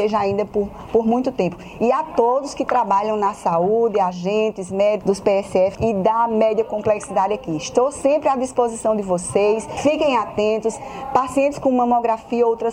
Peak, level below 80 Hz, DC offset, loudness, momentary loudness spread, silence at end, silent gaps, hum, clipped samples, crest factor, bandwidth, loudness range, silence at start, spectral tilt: -2 dBFS; -50 dBFS; under 0.1%; -19 LUFS; 4 LU; 0 s; none; none; under 0.1%; 16 dB; 11.5 kHz; 1 LU; 0 s; -5.5 dB/octave